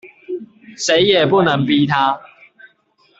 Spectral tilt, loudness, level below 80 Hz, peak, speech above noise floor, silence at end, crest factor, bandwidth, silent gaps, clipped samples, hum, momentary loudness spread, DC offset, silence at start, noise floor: -4.5 dB/octave; -15 LUFS; -56 dBFS; -2 dBFS; 43 dB; 0.95 s; 16 dB; 8 kHz; none; under 0.1%; none; 17 LU; under 0.1%; 0.05 s; -57 dBFS